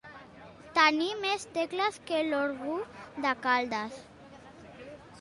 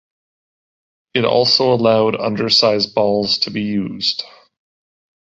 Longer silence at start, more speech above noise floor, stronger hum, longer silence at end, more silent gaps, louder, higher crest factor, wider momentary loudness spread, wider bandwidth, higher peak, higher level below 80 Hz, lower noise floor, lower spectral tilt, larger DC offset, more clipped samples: second, 0.05 s vs 1.15 s; second, 21 dB vs over 74 dB; neither; second, 0 s vs 1.1 s; neither; second, -29 LUFS vs -16 LUFS; first, 22 dB vs 16 dB; first, 25 LU vs 8 LU; first, 11.5 kHz vs 8 kHz; second, -10 dBFS vs -2 dBFS; second, -68 dBFS vs -56 dBFS; second, -51 dBFS vs under -90 dBFS; second, -3 dB/octave vs -5 dB/octave; neither; neither